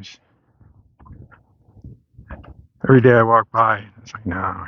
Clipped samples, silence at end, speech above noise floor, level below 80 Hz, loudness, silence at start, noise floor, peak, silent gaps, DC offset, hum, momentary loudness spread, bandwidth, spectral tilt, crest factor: under 0.1%; 0 s; 40 dB; -48 dBFS; -16 LUFS; 0 s; -56 dBFS; 0 dBFS; none; under 0.1%; none; 17 LU; 6.6 kHz; -8.5 dB/octave; 20 dB